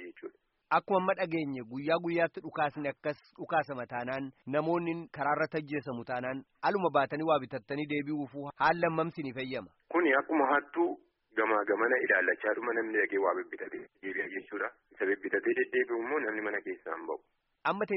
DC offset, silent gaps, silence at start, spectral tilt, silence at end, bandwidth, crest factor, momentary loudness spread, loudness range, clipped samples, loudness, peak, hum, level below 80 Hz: under 0.1%; none; 0 s; -4 dB/octave; 0 s; 5.8 kHz; 20 dB; 11 LU; 4 LU; under 0.1%; -32 LUFS; -14 dBFS; none; -74 dBFS